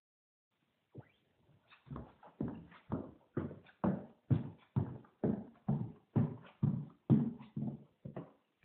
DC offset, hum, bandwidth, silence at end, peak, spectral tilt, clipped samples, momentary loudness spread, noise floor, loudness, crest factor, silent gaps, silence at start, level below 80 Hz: under 0.1%; none; 4 kHz; 0.35 s; -16 dBFS; -10.5 dB/octave; under 0.1%; 17 LU; -72 dBFS; -39 LUFS; 24 dB; none; 0.95 s; -64 dBFS